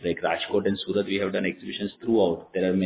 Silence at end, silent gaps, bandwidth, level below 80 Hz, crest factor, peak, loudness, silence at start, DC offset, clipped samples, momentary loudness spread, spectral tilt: 0 s; none; 4 kHz; -56 dBFS; 16 dB; -10 dBFS; -26 LUFS; 0 s; under 0.1%; under 0.1%; 7 LU; -10 dB/octave